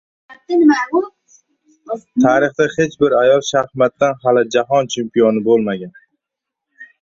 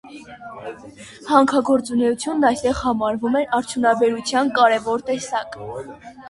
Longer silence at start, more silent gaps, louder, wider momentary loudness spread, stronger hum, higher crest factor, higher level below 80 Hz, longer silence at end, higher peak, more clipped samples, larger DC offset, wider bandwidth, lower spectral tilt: first, 0.3 s vs 0.05 s; neither; first, -15 LUFS vs -19 LUFS; second, 10 LU vs 21 LU; neither; about the same, 16 dB vs 18 dB; second, -58 dBFS vs -50 dBFS; first, 0.15 s vs 0 s; about the same, 0 dBFS vs -2 dBFS; neither; neither; second, 7.6 kHz vs 11.5 kHz; about the same, -5 dB/octave vs -4 dB/octave